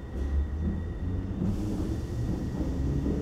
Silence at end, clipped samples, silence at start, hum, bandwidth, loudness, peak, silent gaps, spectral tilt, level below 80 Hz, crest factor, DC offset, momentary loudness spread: 0 s; under 0.1%; 0 s; none; 10.5 kHz; -32 LUFS; -18 dBFS; none; -8.5 dB/octave; -34 dBFS; 12 dB; under 0.1%; 3 LU